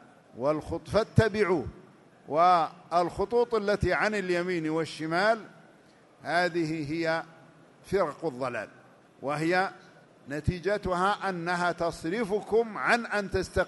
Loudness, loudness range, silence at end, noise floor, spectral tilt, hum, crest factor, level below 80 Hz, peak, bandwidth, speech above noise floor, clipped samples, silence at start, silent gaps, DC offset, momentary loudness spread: -28 LUFS; 5 LU; 0 s; -58 dBFS; -6 dB/octave; none; 22 dB; -50 dBFS; -8 dBFS; 11.5 kHz; 30 dB; under 0.1%; 0.35 s; none; under 0.1%; 8 LU